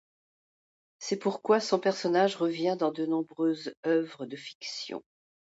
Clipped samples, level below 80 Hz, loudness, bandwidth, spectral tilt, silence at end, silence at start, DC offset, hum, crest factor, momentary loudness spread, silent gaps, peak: under 0.1%; -82 dBFS; -29 LUFS; 8 kHz; -5 dB/octave; 0.4 s; 1 s; under 0.1%; none; 18 dB; 14 LU; 3.77-3.83 s, 4.55-4.61 s; -12 dBFS